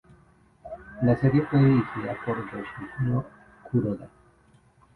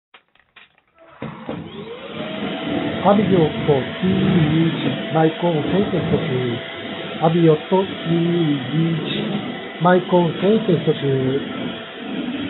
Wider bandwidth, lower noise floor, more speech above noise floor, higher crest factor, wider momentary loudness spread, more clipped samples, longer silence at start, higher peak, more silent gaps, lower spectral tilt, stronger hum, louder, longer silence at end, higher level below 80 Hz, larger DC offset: about the same, 4.4 kHz vs 4.2 kHz; first, -59 dBFS vs -51 dBFS; about the same, 35 dB vs 33 dB; about the same, 18 dB vs 18 dB; first, 19 LU vs 14 LU; neither; second, 0.65 s vs 1.2 s; second, -10 dBFS vs -2 dBFS; neither; first, -10.5 dB/octave vs -5.5 dB/octave; neither; second, -26 LUFS vs -19 LUFS; first, 0.9 s vs 0 s; about the same, -52 dBFS vs -56 dBFS; neither